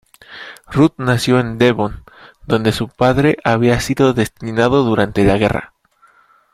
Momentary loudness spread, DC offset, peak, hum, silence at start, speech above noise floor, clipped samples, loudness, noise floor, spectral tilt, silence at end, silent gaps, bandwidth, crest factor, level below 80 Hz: 8 LU; under 0.1%; 0 dBFS; none; 0.3 s; 38 dB; under 0.1%; -15 LUFS; -53 dBFS; -6 dB/octave; 0.9 s; none; 15.5 kHz; 16 dB; -38 dBFS